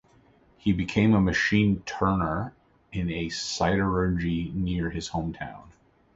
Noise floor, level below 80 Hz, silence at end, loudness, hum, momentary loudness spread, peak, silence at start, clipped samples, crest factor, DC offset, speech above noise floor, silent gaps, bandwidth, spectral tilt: -59 dBFS; -42 dBFS; 0.45 s; -26 LUFS; none; 11 LU; -10 dBFS; 0.65 s; under 0.1%; 18 dB; under 0.1%; 34 dB; none; 8 kHz; -6 dB/octave